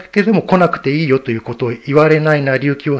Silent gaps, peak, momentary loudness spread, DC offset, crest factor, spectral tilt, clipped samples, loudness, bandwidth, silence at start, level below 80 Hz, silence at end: none; 0 dBFS; 9 LU; under 0.1%; 14 dB; -8 dB/octave; 0.1%; -14 LUFS; 8 kHz; 0 s; -52 dBFS; 0 s